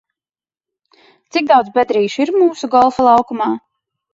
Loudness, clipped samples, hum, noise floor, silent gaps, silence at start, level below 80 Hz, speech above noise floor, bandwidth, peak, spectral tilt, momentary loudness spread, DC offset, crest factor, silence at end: -14 LUFS; under 0.1%; none; under -90 dBFS; none; 1.35 s; -58 dBFS; over 77 dB; 7.8 kHz; 0 dBFS; -5 dB/octave; 9 LU; under 0.1%; 16 dB; 0.55 s